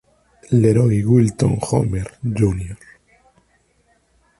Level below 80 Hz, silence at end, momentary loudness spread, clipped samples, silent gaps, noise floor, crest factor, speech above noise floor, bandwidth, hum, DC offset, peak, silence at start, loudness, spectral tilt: -40 dBFS; 1.65 s; 12 LU; under 0.1%; none; -60 dBFS; 18 dB; 44 dB; 11.5 kHz; none; under 0.1%; -2 dBFS; 0.5 s; -18 LUFS; -8 dB/octave